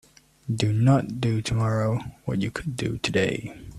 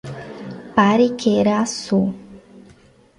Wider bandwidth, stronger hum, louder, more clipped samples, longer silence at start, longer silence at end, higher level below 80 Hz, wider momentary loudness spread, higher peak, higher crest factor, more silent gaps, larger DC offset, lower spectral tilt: first, 12.5 kHz vs 11 kHz; neither; second, -25 LUFS vs -18 LUFS; neither; first, 0.45 s vs 0.05 s; second, 0 s vs 0.6 s; first, -48 dBFS vs -54 dBFS; second, 10 LU vs 18 LU; second, -6 dBFS vs -2 dBFS; about the same, 18 dB vs 18 dB; neither; neither; about the same, -6.5 dB/octave vs -5.5 dB/octave